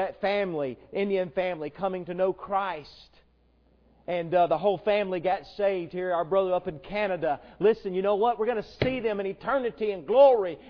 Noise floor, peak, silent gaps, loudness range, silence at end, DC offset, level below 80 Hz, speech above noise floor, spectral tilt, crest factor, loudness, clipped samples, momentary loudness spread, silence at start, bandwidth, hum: -63 dBFS; -8 dBFS; none; 6 LU; 0 s; under 0.1%; -58 dBFS; 37 dB; -8 dB/octave; 18 dB; -27 LUFS; under 0.1%; 8 LU; 0 s; 5.4 kHz; none